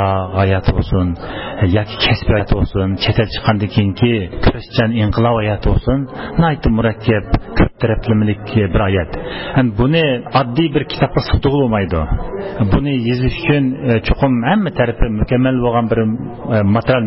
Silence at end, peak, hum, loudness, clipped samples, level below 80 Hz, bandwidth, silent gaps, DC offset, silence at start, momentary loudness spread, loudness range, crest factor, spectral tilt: 0 s; -2 dBFS; none; -16 LUFS; under 0.1%; -26 dBFS; 5.8 kHz; none; 0.5%; 0 s; 5 LU; 1 LU; 12 dB; -11.5 dB/octave